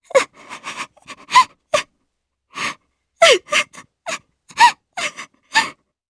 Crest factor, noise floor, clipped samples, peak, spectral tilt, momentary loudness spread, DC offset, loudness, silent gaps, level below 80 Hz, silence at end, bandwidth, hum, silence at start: 20 dB; -73 dBFS; under 0.1%; 0 dBFS; 0 dB/octave; 20 LU; under 0.1%; -17 LUFS; none; -62 dBFS; 0.4 s; 11 kHz; none; 0.15 s